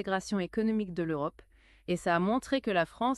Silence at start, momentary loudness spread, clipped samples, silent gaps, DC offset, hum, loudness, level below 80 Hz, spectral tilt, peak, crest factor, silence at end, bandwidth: 0 s; 7 LU; under 0.1%; none; under 0.1%; none; -31 LUFS; -60 dBFS; -6 dB/octave; -14 dBFS; 18 dB; 0 s; 12.5 kHz